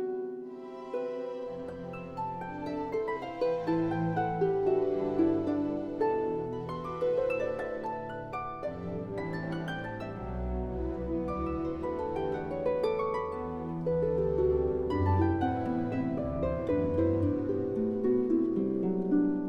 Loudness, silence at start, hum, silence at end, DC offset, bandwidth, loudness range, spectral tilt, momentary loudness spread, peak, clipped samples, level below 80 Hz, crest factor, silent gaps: -32 LUFS; 0 s; none; 0 s; under 0.1%; 7.2 kHz; 6 LU; -9.5 dB/octave; 10 LU; -16 dBFS; under 0.1%; -48 dBFS; 14 dB; none